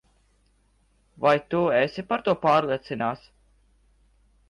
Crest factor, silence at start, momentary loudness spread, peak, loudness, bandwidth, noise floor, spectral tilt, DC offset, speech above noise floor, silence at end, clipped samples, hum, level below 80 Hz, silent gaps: 18 dB; 1.2 s; 8 LU; -8 dBFS; -24 LUFS; 10.5 kHz; -64 dBFS; -7 dB/octave; under 0.1%; 41 dB; 1.35 s; under 0.1%; none; -60 dBFS; none